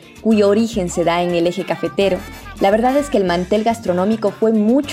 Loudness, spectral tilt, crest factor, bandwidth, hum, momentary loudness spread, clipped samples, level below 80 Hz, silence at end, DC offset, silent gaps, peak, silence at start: -17 LUFS; -6 dB/octave; 14 dB; 15.5 kHz; none; 5 LU; under 0.1%; -42 dBFS; 0 s; under 0.1%; none; -2 dBFS; 0.15 s